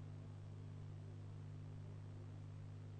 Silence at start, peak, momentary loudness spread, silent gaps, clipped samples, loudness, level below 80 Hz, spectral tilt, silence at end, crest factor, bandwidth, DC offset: 0 s; -44 dBFS; 1 LU; none; under 0.1%; -54 LUFS; -70 dBFS; -8 dB/octave; 0 s; 8 dB; 9 kHz; under 0.1%